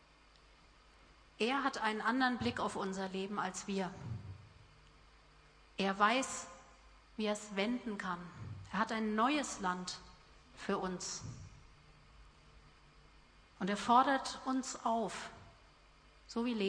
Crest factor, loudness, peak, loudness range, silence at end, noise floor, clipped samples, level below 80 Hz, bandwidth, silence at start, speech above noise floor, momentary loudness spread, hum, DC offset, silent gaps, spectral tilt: 22 dB; -37 LUFS; -16 dBFS; 7 LU; 0 s; -64 dBFS; under 0.1%; -66 dBFS; 10.5 kHz; 1.1 s; 28 dB; 18 LU; none; under 0.1%; none; -4 dB/octave